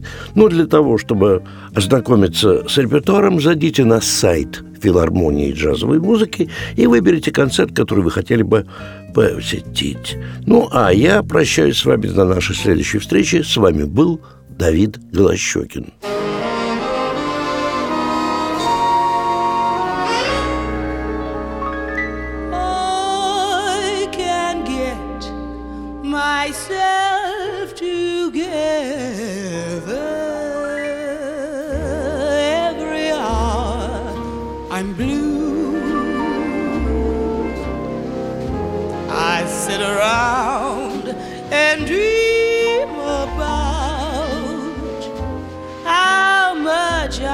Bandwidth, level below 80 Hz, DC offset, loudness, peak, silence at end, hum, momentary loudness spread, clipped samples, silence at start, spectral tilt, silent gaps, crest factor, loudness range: 17.5 kHz; -34 dBFS; under 0.1%; -17 LUFS; 0 dBFS; 0 s; none; 12 LU; under 0.1%; 0 s; -5 dB/octave; none; 16 dB; 7 LU